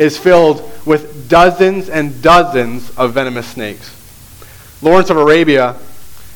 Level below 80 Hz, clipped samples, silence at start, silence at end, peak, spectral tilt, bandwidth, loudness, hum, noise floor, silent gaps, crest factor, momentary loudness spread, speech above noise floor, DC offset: -38 dBFS; 0.1%; 0 s; 0.1 s; 0 dBFS; -5.5 dB/octave; 19.5 kHz; -11 LUFS; none; -36 dBFS; none; 12 dB; 13 LU; 26 dB; under 0.1%